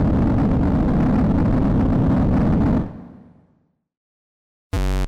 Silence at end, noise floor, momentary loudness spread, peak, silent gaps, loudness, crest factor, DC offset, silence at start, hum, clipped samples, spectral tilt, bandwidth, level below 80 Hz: 0 s; -63 dBFS; 8 LU; -8 dBFS; 3.97-4.70 s; -19 LUFS; 12 dB; under 0.1%; 0 s; none; under 0.1%; -9 dB/octave; 12.5 kHz; -26 dBFS